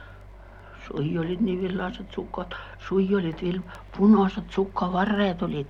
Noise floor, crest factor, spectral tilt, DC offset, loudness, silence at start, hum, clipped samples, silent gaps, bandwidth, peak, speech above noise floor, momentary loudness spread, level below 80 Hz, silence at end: -45 dBFS; 18 dB; -8.5 dB/octave; under 0.1%; -26 LUFS; 0 s; none; under 0.1%; none; 6.8 kHz; -8 dBFS; 20 dB; 15 LU; -46 dBFS; 0 s